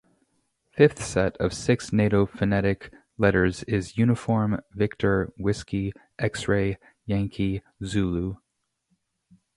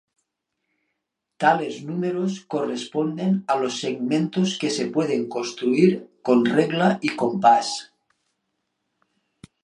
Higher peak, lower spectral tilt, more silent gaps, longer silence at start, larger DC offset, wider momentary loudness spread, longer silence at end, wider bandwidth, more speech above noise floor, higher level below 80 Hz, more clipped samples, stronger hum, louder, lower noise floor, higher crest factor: about the same, -4 dBFS vs -2 dBFS; about the same, -6.5 dB/octave vs -5.5 dB/octave; neither; second, 0.75 s vs 1.4 s; neither; about the same, 9 LU vs 9 LU; second, 1.2 s vs 1.8 s; about the same, 11.5 kHz vs 11 kHz; second, 53 dB vs 58 dB; first, -44 dBFS vs -70 dBFS; neither; neither; second, -25 LUFS vs -22 LUFS; about the same, -77 dBFS vs -80 dBFS; about the same, 22 dB vs 20 dB